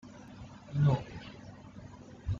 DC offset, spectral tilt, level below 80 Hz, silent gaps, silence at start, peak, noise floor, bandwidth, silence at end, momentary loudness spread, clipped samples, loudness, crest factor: under 0.1%; -8.5 dB/octave; -54 dBFS; none; 0.05 s; -18 dBFS; -50 dBFS; 7.2 kHz; 0 s; 21 LU; under 0.1%; -32 LUFS; 18 dB